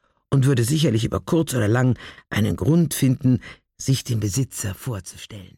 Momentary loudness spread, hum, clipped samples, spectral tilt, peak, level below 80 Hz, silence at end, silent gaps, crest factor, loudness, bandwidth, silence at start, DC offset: 11 LU; none; under 0.1%; -6 dB/octave; -8 dBFS; -48 dBFS; 0.1 s; none; 14 dB; -22 LUFS; 17 kHz; 0.3 s; under 0.1%